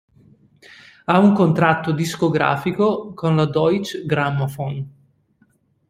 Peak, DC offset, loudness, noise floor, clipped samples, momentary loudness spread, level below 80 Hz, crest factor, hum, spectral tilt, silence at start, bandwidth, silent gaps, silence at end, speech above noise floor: -2 dBFS; under 0.1%; -19 LUFS; -61 dBFS; under 0.1%; 12 LU; -56 dBFS; 18 dB; none; -7 dB/octave; 1.1 s; 15.5 kHz; none; 1 s; 43 dB